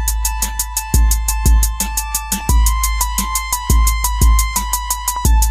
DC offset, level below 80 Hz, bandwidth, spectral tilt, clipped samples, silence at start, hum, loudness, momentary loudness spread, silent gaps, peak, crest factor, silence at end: under 0.1%; -16 dBFS; 16 kHz; -3 dB/octave; under 0.1%; 0 s; none; -16 LUFS; 4 LU; none; 0 dBFS; 14 dB; 0 s